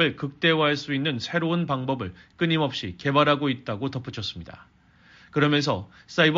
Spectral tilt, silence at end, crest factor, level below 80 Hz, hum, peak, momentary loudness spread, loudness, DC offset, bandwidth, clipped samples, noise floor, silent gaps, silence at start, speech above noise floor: -3.5 dB/octave; 0 s; 20 dB; -58 dBFS; none; -4 dBFS; 11 LU; -25 LUFS; under 0.1%; 7.6 kHz; under 0.1%; -55 dBFS; none; 0 s; 30 dB